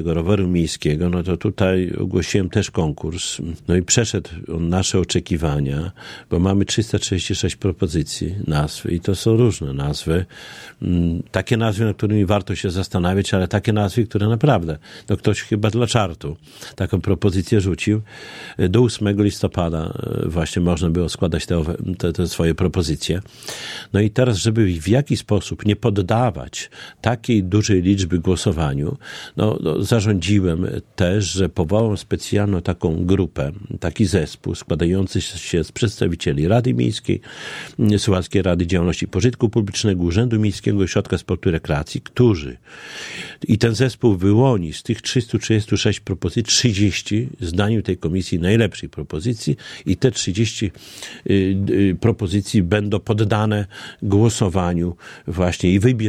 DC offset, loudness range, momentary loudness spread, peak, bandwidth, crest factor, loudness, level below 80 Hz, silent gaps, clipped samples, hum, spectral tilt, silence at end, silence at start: under 0.1%; 2 LU; 10 LU; 0 dBFS; 14.5 kHz; 18 dB; -20 LUFS; -38 dBFS; none; under 0.1%; none; -6 dB/octave; 0 s; 0 s